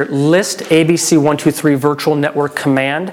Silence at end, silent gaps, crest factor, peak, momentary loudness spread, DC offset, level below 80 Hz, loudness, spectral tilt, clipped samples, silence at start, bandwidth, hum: 0 s; none; 12 dB; -2 dBFS; 4 LU; under 0.1%; -56 dBFS; -13 LUFS; -5 dB/octave; under 0.1%; 0 s; 17 kHz; none